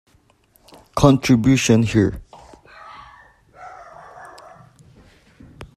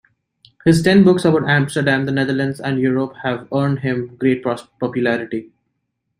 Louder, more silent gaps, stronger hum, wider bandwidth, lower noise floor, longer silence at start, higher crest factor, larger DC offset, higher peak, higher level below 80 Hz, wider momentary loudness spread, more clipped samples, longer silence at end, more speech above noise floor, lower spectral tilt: about the same, -16 LUFS vs -17 LUFS; neither; neither; second, 13.5 kHz vs 15.5 kHz; second, -57 dBFS vs -73 dBFS; first, 0.95 s vs 0.65 s; first, 22 dB vs 16 dB; neither; about the same, 0 dBFS vs -2 dBFS; first, -42 dBFS vs -52 dBFS; first, 26 LU vs 12 LU; neither; second, 0.1 s vs 0.75 s; second, 43 dB vs 57 dB; about the same, -6 dB/octave vs -6.5 dB/octave